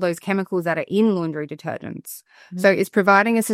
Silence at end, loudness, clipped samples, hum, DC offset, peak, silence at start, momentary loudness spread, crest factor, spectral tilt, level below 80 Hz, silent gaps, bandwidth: 0 s; -20 LUFS; under 0.1%; none; under 0.1%; -2 dBFS; 0 s; 19 LU; 18 dB; -5.5 dB/octave; -70 dBFS; none; 16 kHz